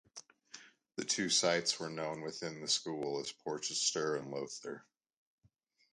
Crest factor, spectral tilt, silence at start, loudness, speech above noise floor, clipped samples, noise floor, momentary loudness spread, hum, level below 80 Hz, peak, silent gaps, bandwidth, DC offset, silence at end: 22 dB; -2 dB/octave; 0.15 s; -35 LUFS; 37 dB; under 0.1%; -74 dBFS; 23 LU; none; -80 dBFS; -18 dBFS; none; 11.5 kHz; under 0.1%; 1.1 s